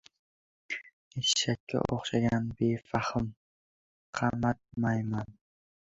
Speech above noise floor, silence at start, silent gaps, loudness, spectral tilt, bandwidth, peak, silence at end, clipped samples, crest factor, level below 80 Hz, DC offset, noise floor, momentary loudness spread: over 60 dB; 0.7 s; 0.93-1.11 s, 1.60-1.67 s, 3.37-4.13 s; -31 LUFS; -4.5 dB/octave; 8.2 kHz; -10 dBFS; 0.65 s; under 0.1%; 22 dB; -56 dBFS; under 0.1%; under -90 dBFS; 11 LU